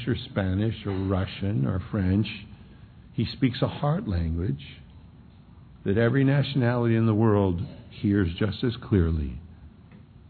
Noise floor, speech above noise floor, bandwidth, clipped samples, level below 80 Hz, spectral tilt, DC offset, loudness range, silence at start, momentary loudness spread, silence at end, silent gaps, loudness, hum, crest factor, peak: -50 dBFS; 25 dB; 4.6 kHz; under 0.1%; -42 dBFS; -11 dB/octave; under 0.1%; 6 LU; 0 s; 13 LU; 0.3 s; none; -26 LUFS; none; 16 dB; -10 dBFS